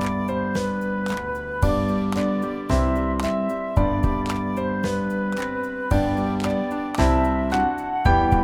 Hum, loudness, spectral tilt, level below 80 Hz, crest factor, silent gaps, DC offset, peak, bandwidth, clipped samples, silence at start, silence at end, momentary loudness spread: none; -23 LUFS; -7 dB/octave; -30 dBFS; 18 dB; none; under 0.1%; -4 dBFS; 16 kHz; under 0.1%; 0 s; 0 s; 6 LU